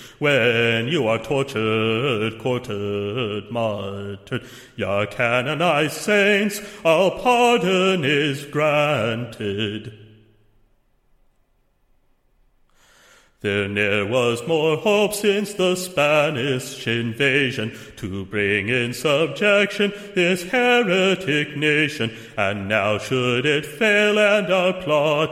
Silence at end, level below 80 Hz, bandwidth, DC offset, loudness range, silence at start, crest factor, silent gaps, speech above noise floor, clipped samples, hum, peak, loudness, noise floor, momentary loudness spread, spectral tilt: 0 s; -56 dBFS; 16.5 kHz; under 0.1%; 7 LU; 0 s; 18 dB; none; 42 dB; under 0.1%; none; -2 dBFS; -20 LUFS; -63 dBFS; 10 LU; -4.5 dB/octave